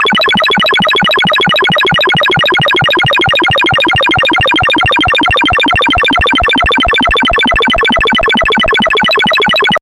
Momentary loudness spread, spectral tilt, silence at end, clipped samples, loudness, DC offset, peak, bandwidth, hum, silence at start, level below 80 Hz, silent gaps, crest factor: 1 LU; -4 dB/octave; 0.05 s; under 0.1%; -8 LUFS; under 0.1%; 0 dBFS; 16.5 kHz; none; 0 s; -28 dBFS; none; 8 dB